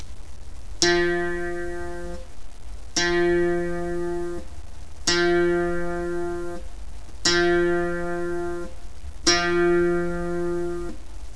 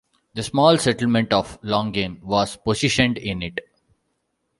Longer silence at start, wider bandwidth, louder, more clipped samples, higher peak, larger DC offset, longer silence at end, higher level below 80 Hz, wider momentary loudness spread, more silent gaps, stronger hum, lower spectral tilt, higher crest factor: second, 0 s vs 0.35 s; about the same, 11 kHz vs 11.5 kHz; second, -24 LUFS vs -21 LUFS; neither; about the same, -2 dBFS vs -2 dBFS; first, 3% vs under 0.1%; second, 0 s vs 1 s; first, -40 dBFS vs -48 dBFS; first, 23 LU vs 13 LU; neither; neither; about the same, -4 dB/octave vs -5 dB/octave; about the same, 24 dB vs 20 dB